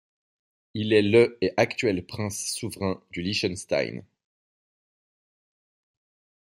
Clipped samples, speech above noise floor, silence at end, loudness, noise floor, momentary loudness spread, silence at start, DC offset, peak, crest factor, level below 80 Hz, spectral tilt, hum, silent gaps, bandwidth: under 0.1%; over 65 dB; 2.45 s; -25 LUFS; under -90 dBFS; 12 LU; 0.75 s; under 0.1%; -4 dBFS; 24 dB; -64 dBFS; -4.5 dB/octave; none; none; 16 kHz